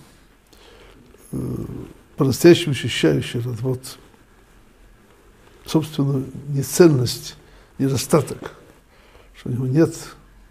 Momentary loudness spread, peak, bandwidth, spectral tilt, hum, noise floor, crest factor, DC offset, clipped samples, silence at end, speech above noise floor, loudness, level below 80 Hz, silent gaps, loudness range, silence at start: 21 LU; 0 dBFS; 15.5 kHz; -6 dB/octave; none; -51 dBFS; 20 dB; under 0.1%; under 0.1%; 0.4 s; 32 dB; -20 LUFS; -50 dBFS; none; 6 LU; 1.3 s